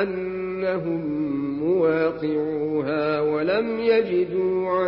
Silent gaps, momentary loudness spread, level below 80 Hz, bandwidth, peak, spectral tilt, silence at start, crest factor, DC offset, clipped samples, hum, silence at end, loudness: none; 6 LU; -58 dBFS; 5.6 kHz; -8 dBFS; -11 dB/octave; 0 s; 14 dB; under 0.1%; under 0.1%; none; 0 s; -23 LUFS